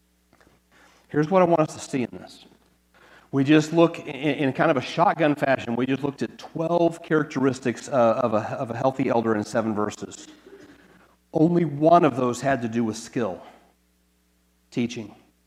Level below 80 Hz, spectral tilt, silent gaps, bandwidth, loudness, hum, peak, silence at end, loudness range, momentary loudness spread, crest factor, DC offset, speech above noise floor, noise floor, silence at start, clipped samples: -66 dBFS; -6.5 dB/octave; none; 12.5 kHz; -23 LUFS; none; -2 dBFS; 0.35 s; 4 LU; 12 LU; 22 dB; under 0.1%; 42 dB; -65 dBFS; 1.1 s; under 0.1%